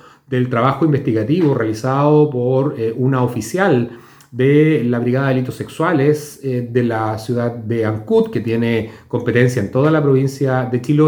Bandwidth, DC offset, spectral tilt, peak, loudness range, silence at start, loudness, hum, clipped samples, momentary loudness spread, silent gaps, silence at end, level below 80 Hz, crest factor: 19.5 kHz; under 0.1%; -7.5 dB/octave; 0 dBFS; 2 LU; 0.3 s; -17 LUFS; none; under 0.1%; 7 LU; none; 0 s; -56 dBFS; 16 dB